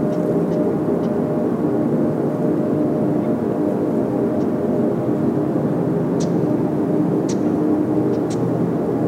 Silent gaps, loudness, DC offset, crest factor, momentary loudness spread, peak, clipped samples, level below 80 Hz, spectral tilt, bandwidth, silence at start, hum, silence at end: none; -19 LUFS; under 0.1%; 12 dB; 1 LU; -6 dBFS; under 0.1%; -54 dBFS; -9 dB/octave; 13 kHz; 0 s; none; 0 s